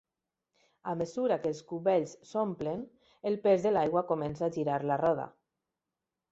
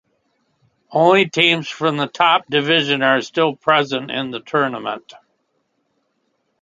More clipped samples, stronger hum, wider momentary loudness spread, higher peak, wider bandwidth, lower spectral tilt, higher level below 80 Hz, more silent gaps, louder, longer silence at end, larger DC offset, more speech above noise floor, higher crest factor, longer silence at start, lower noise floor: neither; neither; about the same, 12 LU vs 11 LU; second, -14 dBFS vs 0 dBFS; second, 8 kHz vs 9.2 kHz; first, -7 dB/octave vs -4.5 dB/octave; about the same, -68 dBFS vs -68 dBFS; neither; second, -31 LUFS vs -17 LUFS; second, 1 s vs 1.6 s; neither; first, 59 dB vs 51 dB; about the same, 18 dB vs 20 dB; about the same, 0.85 s vs 0.9 s; first, -89 dBFS vs -69 dBFS